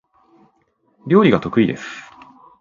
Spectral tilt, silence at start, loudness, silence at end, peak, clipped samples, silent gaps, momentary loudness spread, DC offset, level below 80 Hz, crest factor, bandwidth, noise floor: -7.5 dB/octave; 1.05 s; -16 LUFS; 0.6 s; 0 dBFS; under 0.1%; none; 22 LU; under 0.1%; -54 dBFS; 20 dB; 7.4 kHz; -63 dBFS